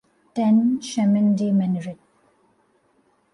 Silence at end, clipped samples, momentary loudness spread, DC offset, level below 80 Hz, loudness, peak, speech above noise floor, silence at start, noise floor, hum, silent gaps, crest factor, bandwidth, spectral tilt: 1.4 s; under 0.1%; 11 LU; under 0.1%; -68 dBFS; -21 LUFS; -10 dBFS; 44 dB; 0.35 s; -63 dBFS; none; none; 12 dB; 11 kHz; -7 dB/octave